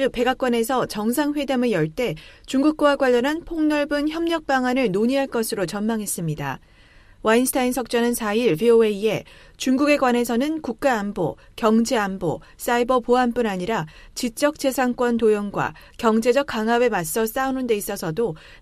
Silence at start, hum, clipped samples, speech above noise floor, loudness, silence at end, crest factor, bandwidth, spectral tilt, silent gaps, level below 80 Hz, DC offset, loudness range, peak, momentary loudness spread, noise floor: 0 s; none; under 0.1%; 29 dB; -22 LUFS; 0.05 s; 16 dB; 15.5 kHz; -4.5 dB/octave; none; -48 dBFS; under 0.1%; 2 LU; -4 dBFS; 9 LU; -50 dBFS